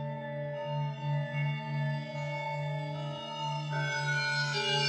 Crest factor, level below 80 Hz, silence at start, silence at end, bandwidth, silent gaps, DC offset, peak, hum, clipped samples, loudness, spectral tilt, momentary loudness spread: 16 dB; -76 dBFS; 0 s; 0 s; 9.6 kHz; none; under 0.1%; -18 dBFS; none; under 0.1%; -34 LUFS; -5 dB/octave; 8 LU